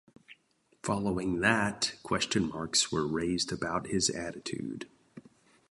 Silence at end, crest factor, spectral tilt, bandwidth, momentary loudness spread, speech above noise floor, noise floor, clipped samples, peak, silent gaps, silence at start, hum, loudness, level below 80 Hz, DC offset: 0.5 s; 24 dB; -3 dB/octave; 11.5 kHz; 11 LU; 39 dB; -70 dBFS; under 0.1%; -10 dBFS; none; 0.3 s; none; -31 LUFS; -58 dBFS; under 0.1%